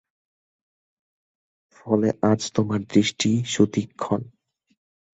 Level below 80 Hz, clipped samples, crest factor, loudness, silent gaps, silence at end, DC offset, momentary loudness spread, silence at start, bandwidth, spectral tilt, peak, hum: -58 dBFS; under 0.1%; 20 dB; -23 LUFS; none; 0.85 s; under 0.1%; 7 LU; 1.85 s; 8.2 kHz; -5.5 dB/octave; -4 dBFS; none